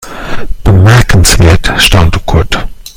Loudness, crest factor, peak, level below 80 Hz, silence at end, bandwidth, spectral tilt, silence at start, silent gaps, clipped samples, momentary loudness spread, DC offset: -7 LUFS; 6 dB; 0 dBFS; -14 dBFS; 0.05 s; over 20 kHz; -4.5 dB/octave; 0 s; none; 4%; 14 LU; under 0.1%